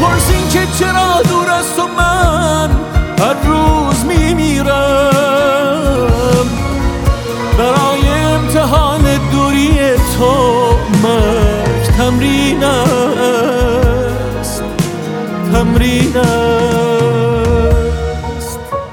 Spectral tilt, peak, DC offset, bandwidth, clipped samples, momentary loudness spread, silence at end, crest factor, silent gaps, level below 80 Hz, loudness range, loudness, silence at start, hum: -5.5 dB/octave; 0 dBFS; under 0.1%; 19 kHz; under 0.1%; 6 LU; 0 s; 12 dB; none; -20 dBFS; 2 LU; -12 LUFS; 0 s; none